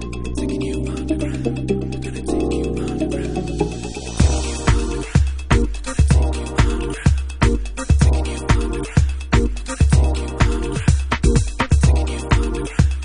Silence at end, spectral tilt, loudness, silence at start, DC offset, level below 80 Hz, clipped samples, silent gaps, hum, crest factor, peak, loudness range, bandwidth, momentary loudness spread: 0 s; -6 dB/octave; -20 LUFS; 0 s; under 0.1%; -20 dBFS; under 0.1%; none; none; 16 dB; -2 dBFS; 4 LU; 11 kHz; 7 LU